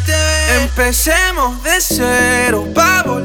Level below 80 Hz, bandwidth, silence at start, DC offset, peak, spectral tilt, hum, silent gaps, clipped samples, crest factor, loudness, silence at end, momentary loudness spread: -22 dBFS; over 20 kHz; 0 s; under 0.1%; 0 dBFS; -3 dB/octave; none; none; under 0.1%; 12 dB; -12 LUFS; 0 s; 3 LU